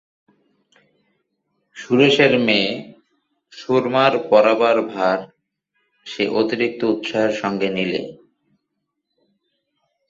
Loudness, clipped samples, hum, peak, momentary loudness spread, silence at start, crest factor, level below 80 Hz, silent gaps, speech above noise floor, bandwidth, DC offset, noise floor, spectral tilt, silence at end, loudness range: -18 LUFS; under 0.1%; none; -2 dBFS; 12 LU; 1.75 s; 20 dB; -64 dBFS; none; 59 dB; 7.8 kHz; under 0.1%; -77 dBFS; -5.5 dB/octave; 1.95 s; 6 LU